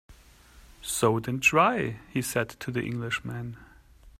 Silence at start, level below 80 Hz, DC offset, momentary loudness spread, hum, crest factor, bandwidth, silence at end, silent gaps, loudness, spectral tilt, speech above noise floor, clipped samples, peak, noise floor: 0.1 s; -56 dBFS; under 0.1%; 15 LU; none; 22 dB; 16 kHz; 0.1 s; none; -27 LUFS; -4.5 dB/octave; 27 dB; under 0.1%; -8 dBFS; -54 dBFS